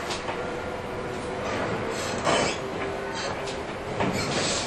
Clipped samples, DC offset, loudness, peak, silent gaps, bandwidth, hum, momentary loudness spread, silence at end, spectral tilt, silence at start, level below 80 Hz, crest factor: under 0.1%; under 0.1%; -29 LUFS; -10 dBFS; none; 13 kHz; none; 8 LU; 0 s; -3.5 dB/octave; 0 s; -48 dBFS; 18 dB